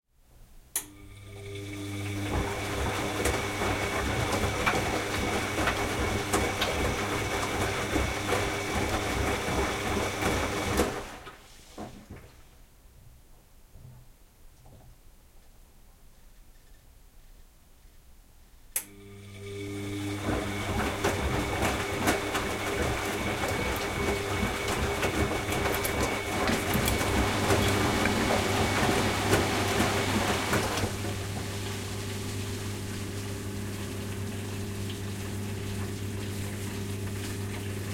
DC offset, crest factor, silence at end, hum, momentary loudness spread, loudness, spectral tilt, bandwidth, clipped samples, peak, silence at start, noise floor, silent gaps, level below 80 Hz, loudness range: under 0.1%; 22 dB; 0 s; none; 10 LU; -30 LUFS; -4 dB/octave; 16.5 kHz; under 0.1%; -10 dBFS; 0.35 s; -55 dBFS; none; -42 dBFS; 9 LU